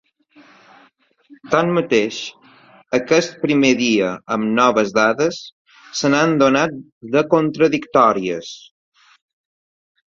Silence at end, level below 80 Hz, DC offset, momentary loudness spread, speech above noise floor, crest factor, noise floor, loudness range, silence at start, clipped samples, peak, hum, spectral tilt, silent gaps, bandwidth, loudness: 1.5 s; -60 dBFS; under 0.1%; 13 LU; 38 dB; 18 dB; -55 dBFS; 3 LU; 1.45 s; under 0.1%; 0 dBFS; none; -5 dB/octave; 5.52-5.65 s, 6.92-7.01 s; 7.6 kHz; -17 LUFS